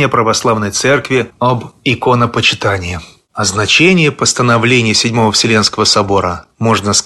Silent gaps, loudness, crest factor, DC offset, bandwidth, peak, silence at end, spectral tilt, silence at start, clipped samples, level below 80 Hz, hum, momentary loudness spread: none; -11 LUFS; 12 dB; under 0.1%; 12.5 kHz; 0 dBFS; 0 s; -3.5 dB/octave; 0 s; under 0.1%; -42 dBFS; none; 8 LU